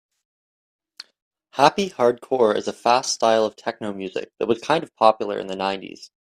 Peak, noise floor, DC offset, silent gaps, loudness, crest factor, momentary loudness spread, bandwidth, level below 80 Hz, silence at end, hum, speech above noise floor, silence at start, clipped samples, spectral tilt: 0 dBFS; under -90 dBFS; under 0.1%; none; -21 LUFS; 22 dB; 12 LU; 15 kHz; -66 dBFS; 0.15 s; none; over 69 dB; 1.55 s; under 0.1%; -3.5 dB/octave